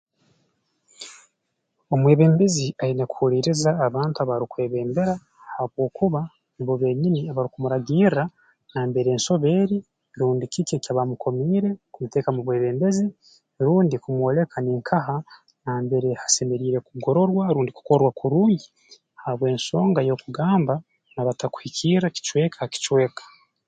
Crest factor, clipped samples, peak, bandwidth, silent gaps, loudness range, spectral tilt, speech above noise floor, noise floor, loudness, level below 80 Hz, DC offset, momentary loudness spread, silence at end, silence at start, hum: 20 dB; under 0.1%; -4 dBFS; 9.4 kHz; none; 3 LU; -6 dB/octave; 55 dB; -76 dBFS; -22 LUFS; -62 dBFS; under 0.1%; 10 LU; 0.45 s; 1 s; none